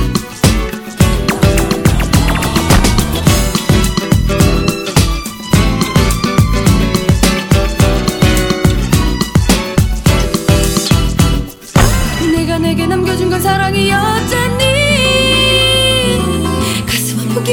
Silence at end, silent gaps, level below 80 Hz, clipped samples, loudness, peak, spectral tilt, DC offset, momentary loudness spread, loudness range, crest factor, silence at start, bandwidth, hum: 0 s; none; -18 dBFS; 0.2%; -12 LUFS; 0 dBFS; -4.5 dB/octave; under 0.1%; 5 LU; 2 LU; 12 dB; 0 s; over 20 kHz; none